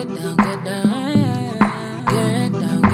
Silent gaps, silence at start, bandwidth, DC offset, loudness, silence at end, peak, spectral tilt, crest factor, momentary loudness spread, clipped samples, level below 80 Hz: none; 0 s; 15.5 kHz; under 0.1%; -19 LUFS; 0 s; 0 dBFS; -6.5 dB/octave; 18 dB; 3 LU; under 0.1%; -46 dBFS